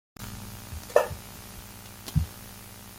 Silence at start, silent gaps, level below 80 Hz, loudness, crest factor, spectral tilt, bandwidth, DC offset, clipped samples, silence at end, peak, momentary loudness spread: 0.2 s; none; -44 dBFS; -31 LUFS; 28 dB; -5 dB/octave; 17 kHz; under 0.1%; under 0.1%; 0 s; -4 dBFS; 17 LU